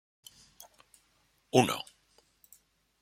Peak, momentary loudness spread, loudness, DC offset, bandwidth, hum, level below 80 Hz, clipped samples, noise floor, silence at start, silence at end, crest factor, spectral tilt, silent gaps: -8 dBFS; 27 LU; -29 LUFS; under 0.1%; 16.5 kHz; none; -72 dBFS; under 0.1%; -71 dBFS; 1.55 s; 1.2 s; 28 dB; -4.5 dB/octave; none